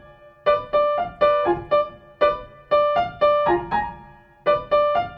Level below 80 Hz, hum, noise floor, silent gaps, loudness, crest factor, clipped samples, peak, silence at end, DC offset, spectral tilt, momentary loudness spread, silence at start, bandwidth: -48 dBFS; none; -46 dBFS; none; -21 LUFS; 16 dB; under 0.1%; -6 dBFS; 0 s; under 0.1%; -7.5 dB/octave; 7 LU; 0.45 s; 5.6 kHz